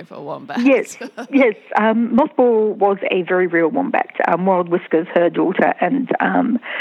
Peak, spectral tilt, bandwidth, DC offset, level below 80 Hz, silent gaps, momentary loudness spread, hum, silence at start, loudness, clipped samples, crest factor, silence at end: -2 dBFS; -6.5 dB/octave; 12 kHz; under 0.1%; -64 dBFS; none; 5 LU; none; 0 s; -17 LUFS; under 0.1%; 14 dB; 0 s